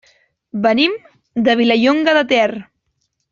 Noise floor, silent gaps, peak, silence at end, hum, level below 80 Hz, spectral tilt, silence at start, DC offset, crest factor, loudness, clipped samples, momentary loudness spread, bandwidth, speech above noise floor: -69 dBFS; none; -2 dBFS; 0.7 s; none; -60 dBFS; -5 dB/octave; 0.55 s; under 0.1%; 14 dB; -15 LUFS; under 0.1%; 15 LU; 7.4 kHz; 55 dB